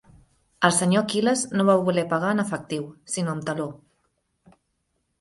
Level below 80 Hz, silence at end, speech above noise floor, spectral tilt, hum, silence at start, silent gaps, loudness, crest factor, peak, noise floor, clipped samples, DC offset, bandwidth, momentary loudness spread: -64 dBFS; 1.45 s; 51 dB; -4.5 dB/octave; none; 0.6 s; none; -23 LUFS; 24 dB; -2 dBFS; -74 dBFS; under 0.1%; under 0.1%; 11.5 kHz; 11 LU